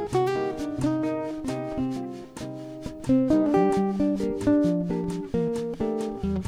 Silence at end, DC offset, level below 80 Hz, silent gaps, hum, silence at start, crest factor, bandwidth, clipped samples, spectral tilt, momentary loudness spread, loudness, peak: 0 s; under 0.1%; -48 dBFS; none; none; 0 s; 16 dB; 12.5 kHz; under 0.1%; -7.5 dB/octave; 15 LU; -26 LUFS; -10 dBFS